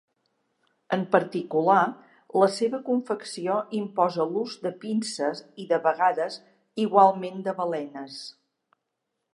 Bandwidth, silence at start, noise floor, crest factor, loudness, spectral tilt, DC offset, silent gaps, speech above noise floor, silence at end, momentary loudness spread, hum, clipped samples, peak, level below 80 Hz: 11.5 kHz; 0.9 s; -81 dBFS; 22 dB; -25 LUFS; -5.5 dB/octave; under 0.1%; none; 56 dB; 1.05 s; 14 LU; none; under 0.1%; -4 dBFS; -84 dBFS